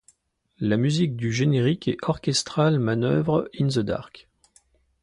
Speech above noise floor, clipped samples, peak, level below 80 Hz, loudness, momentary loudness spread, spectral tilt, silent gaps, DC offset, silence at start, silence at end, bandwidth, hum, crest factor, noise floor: 44 dB; under 0.1%; -6 dBFS; -54 dBFS; -24 LUFS; 5 LU; -6 dB/octave; none; under 0.1%; 0.6 s; 0.95 s; 11.5 kHz; none; 18 dB; -67 dBFS